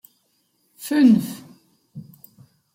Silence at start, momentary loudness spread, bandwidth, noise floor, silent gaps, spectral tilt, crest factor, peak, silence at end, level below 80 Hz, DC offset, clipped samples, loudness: 0.8 s; 27 LU; 16.5 kHz; -67 dBFS; none; -6 dB/octave; 18 dB; -4 dBFS; 0.75 s; -68 dBFS; under 0.1%; under 0.1%; -18 LUFS